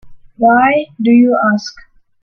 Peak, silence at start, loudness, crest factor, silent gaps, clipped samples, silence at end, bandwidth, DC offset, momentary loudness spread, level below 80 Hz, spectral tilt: 0 dBFS; 0.05 s; -12 LUFS; 12 dB; none; under 0.1%; 0.4 s; 6.8 kHz; under 0.1%; 8 LU; -52 dBFS; -6 dB/octave